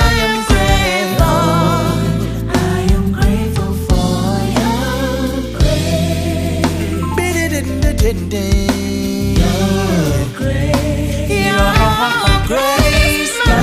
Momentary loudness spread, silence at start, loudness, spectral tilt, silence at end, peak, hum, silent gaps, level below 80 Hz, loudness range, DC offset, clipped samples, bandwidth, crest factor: 6 LU; 0 s; -15 LUFS; -5 dB/octave; 0 s; 0 dBFS; none; none; -20 dBFS; 3 LU; under 0.1%; under 0.1%; 15.5 kHz; 14 dB